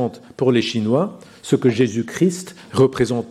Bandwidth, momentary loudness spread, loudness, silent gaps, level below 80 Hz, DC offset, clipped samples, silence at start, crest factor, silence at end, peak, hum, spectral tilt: 13.5 kHz; 9 LU; -19 LUFS; none; -54 dBFS; under 0.1%; under 0.1%; 0 s; 16 dB; 0 s; -2 dBFS; none; -6 dB/octave